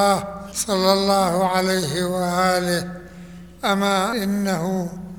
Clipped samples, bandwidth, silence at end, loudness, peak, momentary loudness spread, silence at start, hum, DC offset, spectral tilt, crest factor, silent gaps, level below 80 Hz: under 0.1%; 20 kHz; 0 s; -21 LUFS; -2 dBFS; 13 LU; 0 s; none; 0.2%; -4.5 dB/octave; 20 dB; none; -50 dBFS